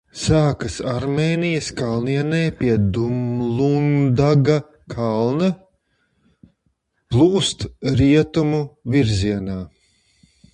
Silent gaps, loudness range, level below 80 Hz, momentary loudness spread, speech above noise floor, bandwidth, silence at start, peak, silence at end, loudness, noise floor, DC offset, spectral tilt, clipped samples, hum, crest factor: none; 3 LU; -40 dBFS; 9 LU; 50 dB; 10.5 kHz; 0.15 s; -2 dBFS; 0.85 s; -19 LUFS; -68 dBFS; under 0.1%; -6.5 dB/octave; under 0.1%; none; 16 dB